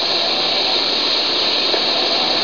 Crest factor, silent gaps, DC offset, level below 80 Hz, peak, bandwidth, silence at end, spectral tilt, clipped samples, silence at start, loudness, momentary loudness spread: 12 dB; none; 0.8%; -58 dBFS; -4 dBFS; 5.4 kHz; 0 s; -1.5 dB/octave; under 0.1%; 0 s; -14 LUFS; 1 LU